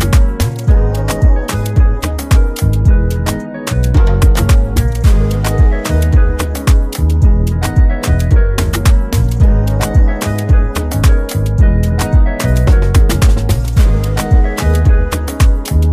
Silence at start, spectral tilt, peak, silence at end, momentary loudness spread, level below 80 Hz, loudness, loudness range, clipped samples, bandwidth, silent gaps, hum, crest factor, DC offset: 0 s; -6 dB/octave; 0 dBFS; 0 s; 4 LU; -12 dBFS; -13 LUFS; 1 LU; under 0.1%; 15.5 kHz; none; none; 10 dB; under 0.1%